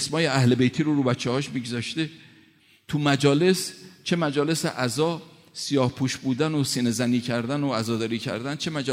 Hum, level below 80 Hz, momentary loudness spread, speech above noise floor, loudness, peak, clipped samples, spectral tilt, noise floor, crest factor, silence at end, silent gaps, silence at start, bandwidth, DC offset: none; -64 dBFS; 9 LU; 34 dB; -24 LUFS; -6 dBFS; under 0.1%; -5 dB/octave; -57 dBFS; 18 dB; 0 s; none; 0 s; 16 kHz; under 0.1%